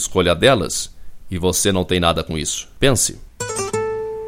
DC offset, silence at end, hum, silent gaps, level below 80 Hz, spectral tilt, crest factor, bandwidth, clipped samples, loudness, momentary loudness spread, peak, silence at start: under 0.1%; 0 s; none; none; -36 dBFS; -3.5 dB/octave; 20 dB; 16.5 kHz; under 0.1%; -18 LUFS; 10 LU; 0 dBFS; 0 s